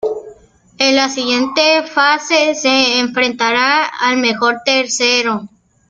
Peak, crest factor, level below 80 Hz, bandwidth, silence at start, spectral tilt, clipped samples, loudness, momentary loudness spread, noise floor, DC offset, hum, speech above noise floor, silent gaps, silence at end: 0 dBFS; 14 dB; -60 dBFS; 9.4 kHz; 0.05 s; -1.5 dB/octave; under 0.1%; -13 LUFS; 4 LU; -44 dBFS; under 0.1%; none; 30 dB; none; 0.45 s